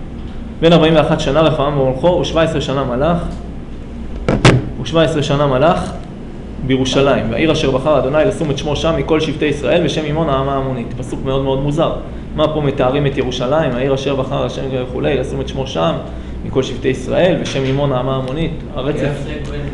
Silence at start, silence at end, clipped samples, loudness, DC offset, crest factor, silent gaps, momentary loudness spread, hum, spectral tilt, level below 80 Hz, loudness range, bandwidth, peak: 0 s; 0 s; under 0.1%; -16 LUFS; under 0.1%; 14 dB; none; 12 LU; none; -6.5 dB/octave; -28 dBFS; 3 LU; 11 kHz; 0 dBFS